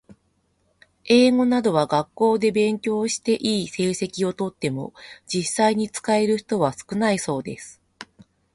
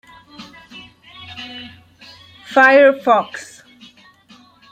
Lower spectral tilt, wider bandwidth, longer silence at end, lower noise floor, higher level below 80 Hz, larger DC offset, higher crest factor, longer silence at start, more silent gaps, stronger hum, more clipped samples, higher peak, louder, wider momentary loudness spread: about the same, -4.5 dB/octave vs -4 dB/octave; first, 11.5 kHz vs 9.2 kHz; second, 0.5 s vs 1.3 s; first, -67 dBFS vs -48 dBFS; about the same, -62 dBFS vs -64 dBFS; neither; about the same, 18 dB vs 18 dB; first, 1.05 s vs 0.4 s; neither; neither; neither; about the same, -4 dBFS vs -2 dBFS; second, -22 LUFS vs -12 LUFS; second, 11 LU vs 29 LU